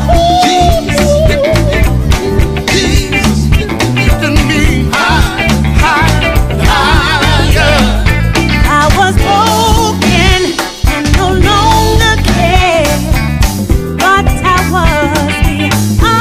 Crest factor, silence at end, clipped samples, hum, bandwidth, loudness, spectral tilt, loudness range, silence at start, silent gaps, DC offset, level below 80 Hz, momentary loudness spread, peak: 8 dB; 0 s; 0.4%; none; 16 kHz; -9 LUFS; -5 dB/octave; 2 LU; 0 s; none; under 0.1%; -14 dBFS; 4 LU; 0 dBFS